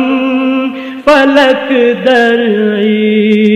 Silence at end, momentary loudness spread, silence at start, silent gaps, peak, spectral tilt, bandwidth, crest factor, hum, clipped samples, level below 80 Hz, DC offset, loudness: 0 s; 6 LU; 0 s; none; 0 dBFS; -6 dB/octave; 10.5 kHz; 8 dB; none; 0.4%; -50 dBFS; under 0.1%; -9 LUFS